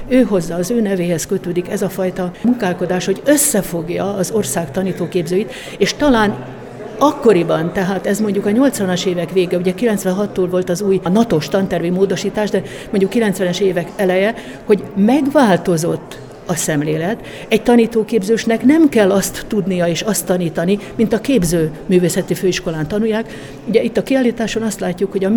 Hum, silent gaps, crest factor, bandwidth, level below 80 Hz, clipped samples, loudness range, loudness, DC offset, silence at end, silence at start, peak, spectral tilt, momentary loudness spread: none; none; 16 dB; 20 kHz; -42 dBFS; under 0.1%; 3 LU; -16 LUFS; under 0.1%; 0 s; 0 s; 0 dBFS; -5 dB/octave; 8 LU